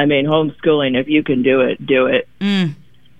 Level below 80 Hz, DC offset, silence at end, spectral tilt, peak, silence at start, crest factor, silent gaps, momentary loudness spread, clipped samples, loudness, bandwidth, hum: -52 dBFS; 0.7%; 0.45 s; -7.5 dB/octave; -2 dBFS; 0 s; 14 dB; none; 4 LU; under 0.1%; -16 LUFS; 8.6 kHz; none